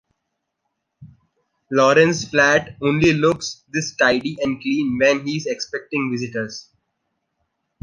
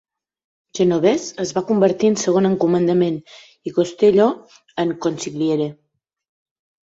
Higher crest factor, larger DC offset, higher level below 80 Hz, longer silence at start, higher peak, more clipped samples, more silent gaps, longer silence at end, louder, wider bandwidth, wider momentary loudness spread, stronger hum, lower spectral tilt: about the same, 20 dB vs 16 dB; neither; first, -52 dBFS vs -62 dBFS; first, 1 s vs 0.75 s; about the same, -2 dBFS vs -2 dBFS; neither; neither; about the same, 1.2 s vs 1.1 s; about the same, -19 LUFS vs -18 LUFS; first, 10.5 kHz vs 8 kHz; about the same, 11 LU vs 12 LU; neither; second, -4.5 dB/octave vs -6 dB/octave